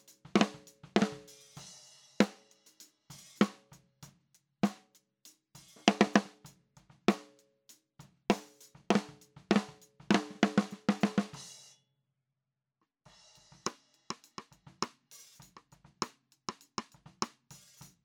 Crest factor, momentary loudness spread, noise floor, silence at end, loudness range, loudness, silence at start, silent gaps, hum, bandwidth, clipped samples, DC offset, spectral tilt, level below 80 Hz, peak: 32 dB; 23 LU; -88 dBFS; 0.8 s; 12 LU; -33 LUFS; 0.35 s; none; none; 16.5 kHz; under 0.1%; under 0.1%; -5 dB/octave; -76 dBFS; -4 dBFS